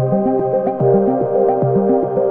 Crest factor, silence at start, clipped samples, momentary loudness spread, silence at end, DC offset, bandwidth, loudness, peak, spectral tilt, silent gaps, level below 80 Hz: 12 dB; 0 s; under 0.1%; 2 LU; 0 s; under 0.1%; 2.7 kHz; -15 LUFS; -2 dBFS; -13.5 dB/octave; none; -50 dBFS